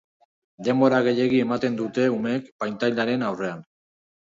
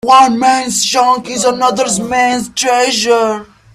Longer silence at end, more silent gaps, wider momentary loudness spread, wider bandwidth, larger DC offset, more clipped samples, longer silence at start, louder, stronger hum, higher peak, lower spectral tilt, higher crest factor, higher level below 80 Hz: first, 0.7 s vs 0.3 s; first, 2.52-2.59 s vs none; first, 11 LU vs 6 LU; second, 7.6 kHz vs 15 kHz; neither; neither; first, 0.6 s vs 0.05 s; second, -23 LUFS vs -12 LUFS; neither; second, -6 dBFS vs 0 dBFS; first, -6.5 dB/octave vs -2 dB/octave; first, 18 dB vs 12 dB; second, -68 dBFS vs -50 dBFS